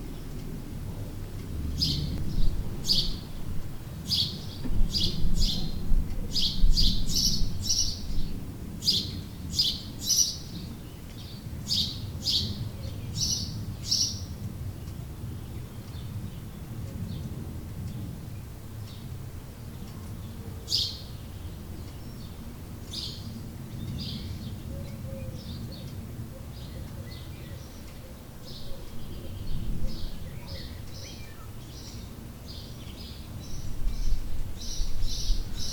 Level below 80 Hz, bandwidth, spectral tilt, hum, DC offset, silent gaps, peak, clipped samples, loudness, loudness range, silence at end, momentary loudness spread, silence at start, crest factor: -34 dBFS; 19.5 kHz; -3 dB/octave; none; under 0.1%; none; -8 dBFS; under 0.1%; -32 LUFS; 13 LU; 0 s; 16 LU; 0 s; 20 dB